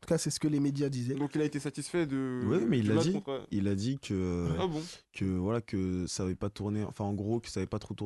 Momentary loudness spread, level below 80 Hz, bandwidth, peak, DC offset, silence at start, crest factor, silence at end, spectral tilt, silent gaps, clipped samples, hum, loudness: 7 LU; -52 dBFS; 12.5 kHz; -16 dBFS; under 0.1%; 0 s; 16 dB; 0 s; -6 dB/octave; none; under 0.1%; none; -33 LUFS